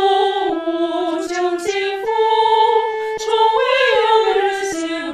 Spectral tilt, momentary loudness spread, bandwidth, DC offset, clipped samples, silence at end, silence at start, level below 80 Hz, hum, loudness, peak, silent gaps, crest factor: -2 dB/octave; 7 LU; 13 kHz; under 0.1%; under 0.1%; 0 s; 0 s; -58 dBFS; none; -17 LUFS; -4 dBFS; none; 14 dB